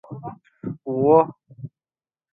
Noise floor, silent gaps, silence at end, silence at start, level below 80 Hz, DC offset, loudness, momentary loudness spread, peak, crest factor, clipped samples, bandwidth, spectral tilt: under -90 dBFS; none; 0.65 s; 0.1 s; -64 dBFS; under 0.1%; -19 LUFS; 24 LU; -2 dBFS; 22 dB; under 0.1%; 3.7 kHz; -12.5 dB/octave